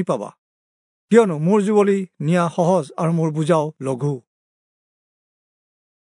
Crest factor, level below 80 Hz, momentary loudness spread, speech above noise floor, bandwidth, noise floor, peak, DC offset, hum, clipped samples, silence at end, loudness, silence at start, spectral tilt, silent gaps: 20 dB; -74 dBFS; 10 LU; over 72 dB; 11 kHz; under -90 dBFS; -2 dBFS; under 0.1%; none; under 0.1%; 1.9 s; -19 LUFS; 0 s; -7.5 dB/octave; 0.38-1.08 s